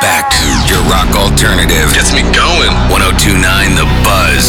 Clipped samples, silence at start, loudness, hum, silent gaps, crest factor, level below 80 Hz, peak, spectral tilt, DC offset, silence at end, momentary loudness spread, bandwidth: under 0.1%; 0 s; -8 LUFS; none; none; 8 dB; -14 dBFS; 0 dBFS; -3.5 dB/octave; under 0.1%; 0 s; 2 LU; 19 kHz